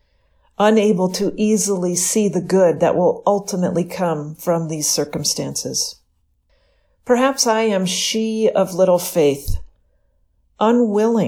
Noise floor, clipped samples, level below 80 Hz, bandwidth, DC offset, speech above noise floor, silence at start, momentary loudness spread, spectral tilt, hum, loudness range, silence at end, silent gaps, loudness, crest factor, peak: -63 dBFS; under 0.1%; -40 dBFS; 19 kHz; under 0.1%; 46 dB; 0.6 s; 7 LU; -4 dB/octave; none; 4 LU; 0 s; none; -18 LUFS; 16 dB; -2 dBFS